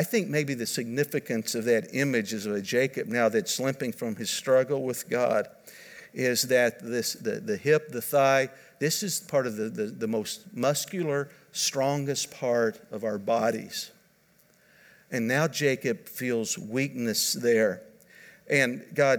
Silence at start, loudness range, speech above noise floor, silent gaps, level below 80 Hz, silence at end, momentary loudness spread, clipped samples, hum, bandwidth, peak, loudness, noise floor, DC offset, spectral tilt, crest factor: 0 s; 3 LU; 36 dB; none; -78 dBFS; 0 s; 8 LU; under 0.1%; none; over 20 kHz; -8 dBFS; -27 LUFS; -63 dBFS; under 0.1%; -4 dB/octave; 20 dB